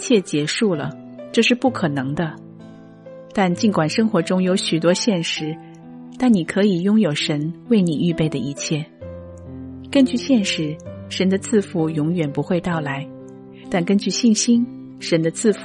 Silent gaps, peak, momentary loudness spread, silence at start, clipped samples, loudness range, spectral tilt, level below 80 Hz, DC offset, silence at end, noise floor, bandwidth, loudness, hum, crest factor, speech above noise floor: none; -4 dBFS; 18 LU; 0 s; under 0.1%; 2 LU; -5 dB/octave; -56 dBFS; under 0.1%; 0 s; -41 dBFS; 11.5 kHz; -20 LUFS; none; 16 dB; 22 dB